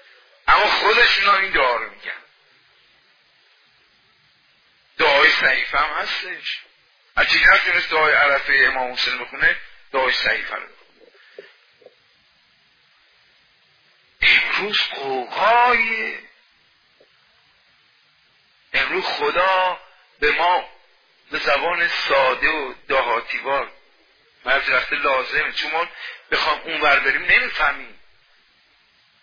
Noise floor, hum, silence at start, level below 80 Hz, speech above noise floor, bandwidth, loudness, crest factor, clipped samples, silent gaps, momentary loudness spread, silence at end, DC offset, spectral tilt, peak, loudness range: -58 dBFS; none; 0.45 s; -48 dBFS; 39 dB; 5.4 kHz; -18 LUFS; 20 dB; under 0.1%; none; 14 LU; 1.3 s; under 0.1%; -2.5 dB/octave; 0 dBFS; 9 LU